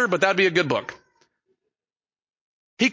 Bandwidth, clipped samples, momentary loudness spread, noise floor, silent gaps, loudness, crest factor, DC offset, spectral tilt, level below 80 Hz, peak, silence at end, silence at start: 7.6 kHz; under 0.1%; 10 LU; under -90 dBFS; 2.30-2.34 s, 2.41-2.77 s; -21 LUFS; 22 dB; under 0.1%; -4.5 dB/octave; -68 dBFS; -4 dBFS; 0 s; 0 s